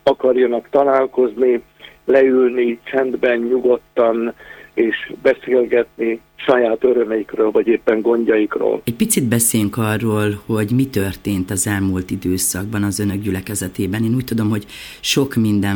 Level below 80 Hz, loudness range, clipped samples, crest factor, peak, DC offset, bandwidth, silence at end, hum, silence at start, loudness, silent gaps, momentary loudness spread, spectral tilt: -50 dBFS; 3 LU; under 0.1%; 16 dB; 0 dBFS; under 0.1%; over 20 kHz; 0 s; none; 0.05 s; -17 LUFS; none; 8 LU; -5 dB/octave